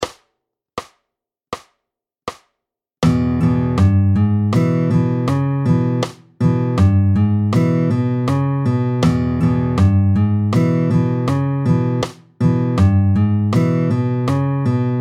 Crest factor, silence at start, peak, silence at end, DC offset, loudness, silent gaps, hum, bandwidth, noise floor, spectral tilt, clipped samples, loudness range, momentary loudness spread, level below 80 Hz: 14 dB; 0 s; -2 dBFS; 0 s; under 0.1%; -17 LUFS; none; none; 10.5 kHz; -81 dBFS; -8.5 dB/octave; under 0.1%; 3 LU; 12 LU; -40 dBFS